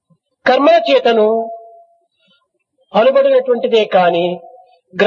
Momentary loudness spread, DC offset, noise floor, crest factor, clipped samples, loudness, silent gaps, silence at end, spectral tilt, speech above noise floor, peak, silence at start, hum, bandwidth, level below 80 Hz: 15 LU; under 0.1%; -63 dBFS; 14 dB; under 0.1%; -13 LUFS; none; 0 s; -6 dB/octave; 51 dB; 0 dBFS; 0.45 s; none; 7.2 kHz; -66 dBFS